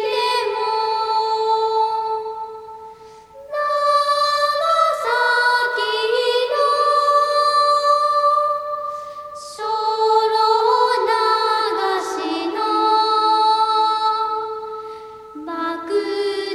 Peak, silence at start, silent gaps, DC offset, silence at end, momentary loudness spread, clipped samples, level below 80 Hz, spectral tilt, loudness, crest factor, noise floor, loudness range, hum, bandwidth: -4 dBFS; 0 s; none; under 0.1%; 0 s; 14 LU; under 0.1%; -64 dBFS; -1.5 dB/octave; -18 LUFS; 14 dB; -41 dBFS; 4 LU; none; 13.5 kHz